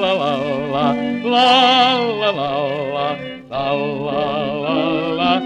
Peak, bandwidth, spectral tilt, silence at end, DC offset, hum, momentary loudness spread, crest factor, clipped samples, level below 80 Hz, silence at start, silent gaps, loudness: 0 dBFS; 10 kHz; -5 dB/octave; 0 s; under 0.1%; none; 10 LU; 16 dB; under 0.1%; -52 dBFS; 0 s; none; -17 LUFS